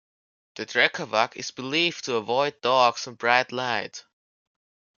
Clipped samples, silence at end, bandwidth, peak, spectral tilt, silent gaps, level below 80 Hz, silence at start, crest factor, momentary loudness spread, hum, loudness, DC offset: under 0.1%; 1 s; 7.4 kHz; -2 dBFS; -3 dB/octave; none; -76 dBFS; 0.55 s; 24 dB; 10 LU; none; -24 LUFS; under 0.1%